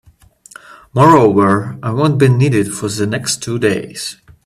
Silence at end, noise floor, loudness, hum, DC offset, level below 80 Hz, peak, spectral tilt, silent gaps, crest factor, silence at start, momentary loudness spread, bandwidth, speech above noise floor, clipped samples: 0.35 s; -45 dBFS; -13 LUFS; none; under 0.1%; -50 dBFS; 0 dBFS; -6 dB/octave; none; 14 dB; 0.7 s; 13 LU; 14.5 kHz; 32 dB; under 0.1%